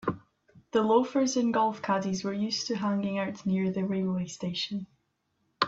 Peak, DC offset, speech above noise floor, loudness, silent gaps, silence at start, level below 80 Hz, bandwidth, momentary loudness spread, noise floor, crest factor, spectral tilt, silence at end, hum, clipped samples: -8 dBFS; under 0.1%; 48 dB; -29 LUFS; none; 0 s; -68 dBFS; 7.8 kHz; 9 LU; -76 dBFS; 20 dB; -5 dB/octave; 0 s; none; under 0.1%